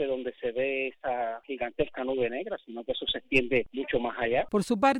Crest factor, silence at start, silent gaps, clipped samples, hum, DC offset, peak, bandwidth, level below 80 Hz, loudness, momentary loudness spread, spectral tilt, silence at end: 18 dB; 0 s; none; under 0.1%; none; under 0.1%; -10 dBFS; 15 kHz; -52 dBFS; -30 LUFS; 9 LU; -5 dB/octave; 0 s